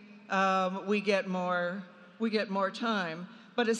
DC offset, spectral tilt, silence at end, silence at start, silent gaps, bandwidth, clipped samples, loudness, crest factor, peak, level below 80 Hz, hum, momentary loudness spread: under 0.1%; -5 dB/octave; 0 s; 0 s; none; 10 kHz; under 0.1%; -31 LUFS; 18 dB; -14 dBFS; -86 dBFS; none; 10 LU